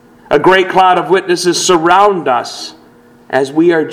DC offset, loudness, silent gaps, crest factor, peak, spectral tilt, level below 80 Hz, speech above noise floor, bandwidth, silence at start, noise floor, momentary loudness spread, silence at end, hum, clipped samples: under 0.1%; -11 LUFS; none; 12 dB; 0 dBFS; -3.5 dB/octave; -50 dBFS; 32 dB; 15.5 kHz; 0.3 s; -42 dBFS; 9 LU; 0 s; none; 0.4%